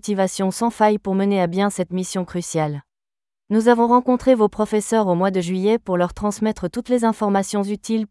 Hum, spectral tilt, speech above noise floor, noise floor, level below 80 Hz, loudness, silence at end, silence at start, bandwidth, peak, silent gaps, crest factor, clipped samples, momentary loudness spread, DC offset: none; -6 dB/octave; over 71 dB; under -90 dBFS; -50 dBFS; -20 LUFS; 0.05 s; 0.05 s; 12 kHz; -2 dBFS; none; 16 dB; under 0.1%; 8 LU; under 0.1%